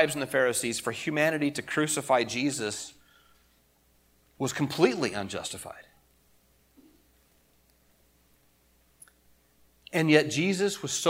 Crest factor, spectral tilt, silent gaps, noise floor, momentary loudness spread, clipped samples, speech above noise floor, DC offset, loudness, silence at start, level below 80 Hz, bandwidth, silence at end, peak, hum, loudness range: 26 dB; -4 dB/octave; none; -65 dBFS; 13 LU; under 0.1%; 38 dB; under 0.1%; -27 LUFS; 0 s; -68 dBFS; 16.5 kHz; 0 s; -4 dBFS; none; 10 LU